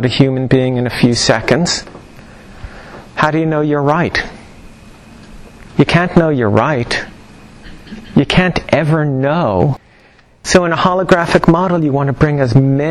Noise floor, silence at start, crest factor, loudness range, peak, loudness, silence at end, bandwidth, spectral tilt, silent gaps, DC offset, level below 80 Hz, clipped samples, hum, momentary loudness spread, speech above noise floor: -46 dBFS; 0 s; 14 dB; 4 LU; 0 dBFS; -13 LUFS; 0 s; 12 kHz; -6 dB/octave; none; under 0.1%; -36 dBFS; under 0.1%; none; 16 LU; 34 dB